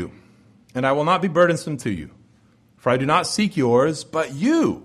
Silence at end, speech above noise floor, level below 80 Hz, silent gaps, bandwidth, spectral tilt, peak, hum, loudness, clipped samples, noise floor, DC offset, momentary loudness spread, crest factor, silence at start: 0.05 s; 36 dB; -56 dBFS; none; 12.5 kHz; -5.5 dB/octave; -4 dBFS; none; -20 LUFS; under 0.1%; -56 dBFS; under 0.1%; 10 LU; 18 dB; 0 s